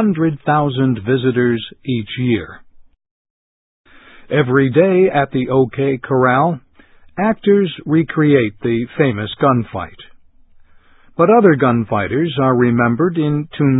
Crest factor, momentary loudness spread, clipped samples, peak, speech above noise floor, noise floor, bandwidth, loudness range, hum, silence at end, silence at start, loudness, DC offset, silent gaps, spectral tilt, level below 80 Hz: 16 dB; 9 LU; under 0.1%; 0 dBFS; 31 dB; -46 dBFS; 4 kHz; 5 LU; none; 0 s; 0 s; -15 LUFS; under 0.1%; 3.11-3.84 s; -12 dB/octave; -48 dBFS